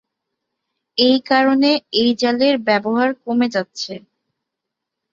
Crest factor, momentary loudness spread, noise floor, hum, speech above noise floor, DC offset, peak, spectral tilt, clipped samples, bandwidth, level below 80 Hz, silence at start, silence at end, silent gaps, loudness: 18 dB; 12 LU; -81 dBFS; none; 64 dB; under 0.1%; -2 dBFS; -4.5 dB/octave; under 0.1%; 7.6 kHz; -64 dBFS; 0.95 s; 1.15 s; none; -17 LUFS